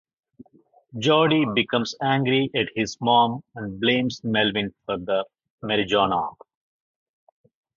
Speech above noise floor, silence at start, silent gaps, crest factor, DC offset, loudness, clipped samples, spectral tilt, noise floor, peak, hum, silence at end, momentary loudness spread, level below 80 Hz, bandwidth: 36 dB; 0.95 s; 5.50-5.58 s; 20 dB; under 0.1%; -22 LUFS; under 0.1%; -5.5 dB/octave; -58 dBFS; -4 dBFS; none; 1.45 s; 12 LU; -58 dBFS; 7.6 kHz